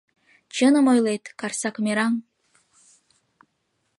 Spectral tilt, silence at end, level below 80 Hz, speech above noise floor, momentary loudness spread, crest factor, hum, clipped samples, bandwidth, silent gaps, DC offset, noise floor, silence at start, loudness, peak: -4 dB/octave; 1.75 s; -78 dBFS; 52 dB; 12 LU; 16 dB; none; under 0.1%; 11.5 kHz; none; under 0.1%; -73 dBFS; 0.55 s; -22 LUFS; -8 dBFS